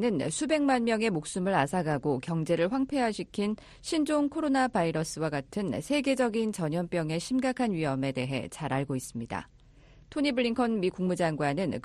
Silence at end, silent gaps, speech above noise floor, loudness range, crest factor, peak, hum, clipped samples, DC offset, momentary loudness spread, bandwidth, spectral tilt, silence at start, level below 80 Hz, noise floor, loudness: 0.05 s; none; 27 dB; 3 LU; 16 dB; -12 dBFS; none; under 0.1%; under 0.1%; 7 LU; 13 kHz; -5.5 dB/octave; 0 s; -58 dBFS; -56 dBFS; -29 LUFS